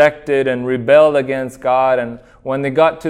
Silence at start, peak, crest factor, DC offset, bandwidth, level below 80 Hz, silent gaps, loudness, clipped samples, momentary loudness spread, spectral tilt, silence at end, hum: 0 s; 0 dBFS; 14 dB; under 0.1%; 11 kHz; -50 dBFS; none; -15 LUFS; under 0.1%; 12 LU; -6.5 dB/octave; 0 s; none